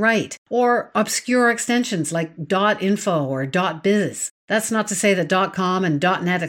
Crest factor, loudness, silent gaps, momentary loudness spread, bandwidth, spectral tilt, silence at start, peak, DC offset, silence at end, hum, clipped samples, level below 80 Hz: 16 dB; -20 LUFS; 0.38-0.46 s, 4.31-4.48 s; 5 LU; 18.5 kHz; -4.5 dB/octave; 0 s; -4 dBFS; under 0.1%; 0 s; none; under 0.1%; -66 dBFS